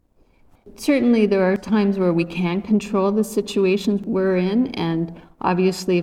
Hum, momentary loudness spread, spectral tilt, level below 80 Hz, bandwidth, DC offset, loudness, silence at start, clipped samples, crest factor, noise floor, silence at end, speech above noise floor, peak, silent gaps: none; 7 LU; -6.5 dB/octave; -52 dBFS; 15.5 kHz; under 0.1%; -20 LUFS; 0.65 s; under 0.1%; 14 dB; -56 dBFS; 0 s; 36 dB; -6 dBFS; none